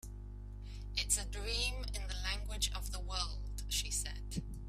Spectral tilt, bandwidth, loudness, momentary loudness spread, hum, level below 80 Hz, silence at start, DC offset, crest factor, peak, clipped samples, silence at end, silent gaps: -2 dB/octave; 15.5 kHz; -38 LUFS; 15 LU; 50 Hz at -40 dBFS; -42 dBFS; 0.05 s; under 0.1%; 22 dB; -18 dBFS; under 0.1%; 0 s; none